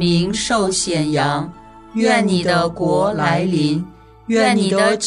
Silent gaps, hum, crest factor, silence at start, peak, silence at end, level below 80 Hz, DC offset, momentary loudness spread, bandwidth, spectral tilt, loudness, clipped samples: none; none; 16 dB; 0 s; -2 dBFS; 0 s; -46 dBFS; under 0.1%; 9 LU; 11 kHz; -4.5 dB/octave; -17 LUFS; under 0.1%